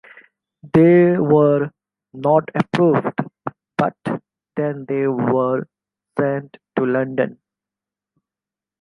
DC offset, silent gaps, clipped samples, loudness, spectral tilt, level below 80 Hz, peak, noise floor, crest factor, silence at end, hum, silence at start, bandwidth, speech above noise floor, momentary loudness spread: under 0.1%; none; under 0.1%; -19 LUFS; -9.5 dB/octave; -60 dBFS; -2 dBFS; -89 dBFS; 18 dB; 1.5 s; none; 0.65 s; 9.6 kHz; 72 dB; 14 LU